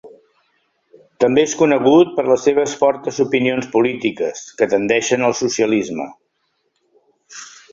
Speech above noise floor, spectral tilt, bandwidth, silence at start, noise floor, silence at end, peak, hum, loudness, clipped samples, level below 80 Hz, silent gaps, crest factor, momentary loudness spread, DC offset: 52 dB; -4.5 dB/octave; 7.8 kHz; 0.05 s; -68 dBFS; 0.3 s; 0 dBFS; none; -16 LUFS; under 0.1%; -60 dBFS; none; 16 dB; 14 LU; under 0.1%